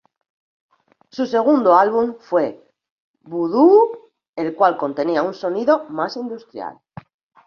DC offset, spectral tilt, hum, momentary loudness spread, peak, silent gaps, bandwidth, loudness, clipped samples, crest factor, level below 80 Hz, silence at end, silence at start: under 0.1%; -7 dB/octave; none; 19 LU; -2 dBFS; 2.91-3.14 s, 4.29-4.33 s; 6.8 kHz; -18 LUFS; under 0.1%; 18 dB; -66 dBFS; 0.75 s; 1.15 s